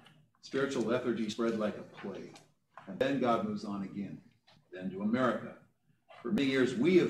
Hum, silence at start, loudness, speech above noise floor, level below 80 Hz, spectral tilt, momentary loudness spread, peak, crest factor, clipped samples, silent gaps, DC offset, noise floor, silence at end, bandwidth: none; 0.45 s; -34 LUFS; 31 dB; -72 dBFS; -6 dB/octave; 19 LU; -14 dBFS; 20 dB; under 0.1%; none; under 0.1%; -63 dBFS; 0 s; 11 kHz